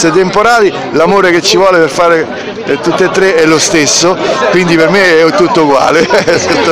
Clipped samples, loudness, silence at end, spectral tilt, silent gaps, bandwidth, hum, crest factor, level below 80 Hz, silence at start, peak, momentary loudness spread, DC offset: 1%; -7 LUFS; 0 s; -3.5 dB/octave; none; 16 kHz; none; 8 dB; -42 dBFS; 0 s; 0 dBFS; 4 LU; 0.6%